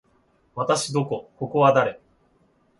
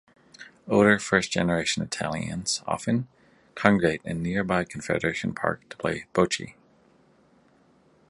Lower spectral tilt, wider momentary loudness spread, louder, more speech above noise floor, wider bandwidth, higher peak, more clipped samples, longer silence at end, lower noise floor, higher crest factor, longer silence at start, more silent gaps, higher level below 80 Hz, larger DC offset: about the same, -5 dB/octave vs -4.5 dB/octave; first, 12 LU vs 9 LU; first, -22 LUFS vs -25 LUFS; first, 41 dB vs 35 dB; about the same, 11.5 kHz vs 11.5 kHz; second, -4 dBFS vs 0 dBFS; neither; second, 0.85 s vs 1.6 s; about the same, -63 dBFS vs -60 dBFS; second, 20 dB vs 26 dB; first, 0.55 s vs 0.4 s; neither; second, -66 dBFS vs -54 dBFS; neither